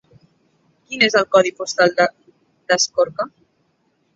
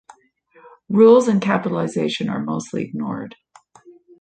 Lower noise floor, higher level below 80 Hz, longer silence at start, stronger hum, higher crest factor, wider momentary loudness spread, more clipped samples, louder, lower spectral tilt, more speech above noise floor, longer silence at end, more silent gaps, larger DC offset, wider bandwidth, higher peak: first, -65 dBFS vs -55 dBFS; about the same, -66 dBFS vs -64 dBFS; about the same, 0.9 s vs 0.9 s; neither; about the same, 20 dB vs 18 dB; second, 11 LU vs 15 LU; neither; about the same, -17 LUFS vs -18 LUFS; second, -2 dB/octave vs -6.5 dB/octave; first, 48 dB vs 37 dB; about the same, 0.9 s vs 0.9 s; neither; neither; second, 7.8 kHz vs 9.2 kHz; about the same, -2 dBFS vs -2 dBFS